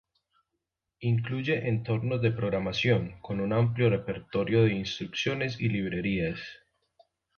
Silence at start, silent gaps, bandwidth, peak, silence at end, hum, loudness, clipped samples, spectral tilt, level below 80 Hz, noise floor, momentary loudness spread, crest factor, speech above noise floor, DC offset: 1 s; none; 6.8 kHz; -10 dBFS; 0.8 s; none; -29 LUFS; under 0.1%; -7 dB/octave; -54 dBFS; -84 dBFS; 8 LU; 18 dB; 56 dB; under 0.1%